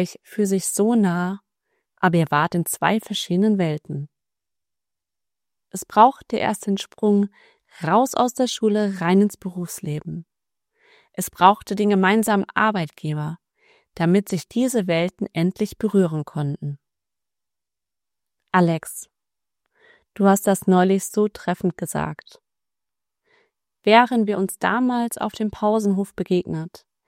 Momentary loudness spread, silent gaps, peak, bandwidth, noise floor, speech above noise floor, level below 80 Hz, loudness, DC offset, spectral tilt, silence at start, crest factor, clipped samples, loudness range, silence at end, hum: 14 LU; none; 0 dBFS; 16 kHz; -89 dBFS; 69 dB; -60 dBFS; -21 LUFS; under 0.1%; -5.5 dB/octave; 0 s; 22 dB; under 0.1%; 5 LU; 0.4 s; none